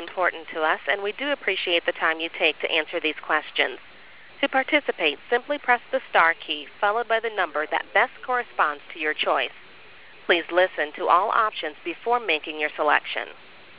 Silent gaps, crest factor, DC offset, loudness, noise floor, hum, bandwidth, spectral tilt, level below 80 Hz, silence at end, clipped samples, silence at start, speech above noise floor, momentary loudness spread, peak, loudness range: none; 22 dB; 0.4%; -23 LUFS; -48 dBFS; none; 4 kHz; -5.5 dB/octave; -68 dBFS; 0.45 s; under 0.1%; 0 s; 24 dB; 7 LU; -4 dBFS; 2 LU